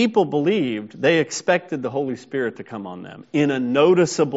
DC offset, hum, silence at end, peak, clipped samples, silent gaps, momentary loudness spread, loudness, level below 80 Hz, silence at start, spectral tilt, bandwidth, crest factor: under 0.1%; none; 0 s; -4 dBFS; under 0.1%; none; 16 LU; -20 LUFS; -66 dBFS; 0 s; -4.5 dB/octave; 8 kHz; 16 dB